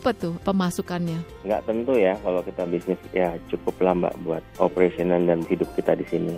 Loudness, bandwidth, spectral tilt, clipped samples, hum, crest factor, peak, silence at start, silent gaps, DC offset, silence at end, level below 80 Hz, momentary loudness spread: -24 LUFS; 16 kHz; -7 dB/octave; under 0.1%; none; 20 dB; -4 dBFS; 0 s; none; under 0.1%; 0 s; -50 dBFS; 7 LU